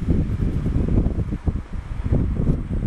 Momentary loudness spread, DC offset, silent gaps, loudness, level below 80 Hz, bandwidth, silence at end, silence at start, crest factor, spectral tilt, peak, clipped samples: 7 LU; under 0.1%; none; -24 LUFS; -24 dBFS; 8.4 kHz; 0 s; 0 s; 14 dB; -10 dB/octave; -6 dBFS; under 0.1%